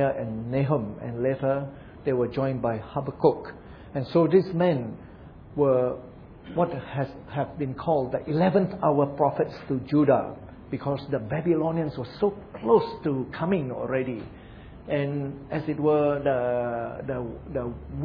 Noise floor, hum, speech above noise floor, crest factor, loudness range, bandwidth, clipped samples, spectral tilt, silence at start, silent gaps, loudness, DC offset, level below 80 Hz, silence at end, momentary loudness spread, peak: -45 dBFS; none; 20 dB; 20 dB; 3 LU; 5.4 kHz; under 0.1%; -10.5 dB/octave; 0 s; none; -26 LUFS; under 0.1%; -52 dBFS; 0 s; 13 LU; -6 dBFS